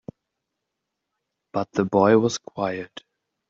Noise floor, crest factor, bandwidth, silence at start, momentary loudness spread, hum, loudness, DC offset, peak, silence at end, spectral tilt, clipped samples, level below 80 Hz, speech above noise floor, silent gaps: -82 dBFS; 20 dB; 7.8 kHz; 1.55 s; 15 LU; none; -22 LUFS; under 0.1%; -4 dBFS; 0.5 s; -5.5 dB/octave; under 0.1%; -66 dBFS; 60 dB; none